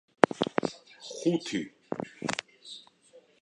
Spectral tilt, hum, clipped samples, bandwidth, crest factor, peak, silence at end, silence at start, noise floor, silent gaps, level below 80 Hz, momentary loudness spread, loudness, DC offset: -4.5 dB/octave; none; under 0.1%; 11 kHz; 32 dB; 0 dBFS; 0.25 s; 0.35 s; -59 dBFS; none; -72 dBFS; 20 LU; -31 LUFS; under 0.1%